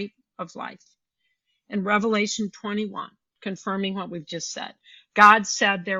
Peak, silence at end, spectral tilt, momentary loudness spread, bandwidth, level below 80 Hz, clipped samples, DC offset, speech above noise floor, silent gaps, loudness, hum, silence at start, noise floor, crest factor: -2 dBFS; 0 s; -3.5 dB/octave; 22 LU; 8.2 kHz; -72 dBFS; under 0.1%; under 0.1%; 52 dB; none; -22 LUFS; none; 0 s; -75 dBFS; 22 dB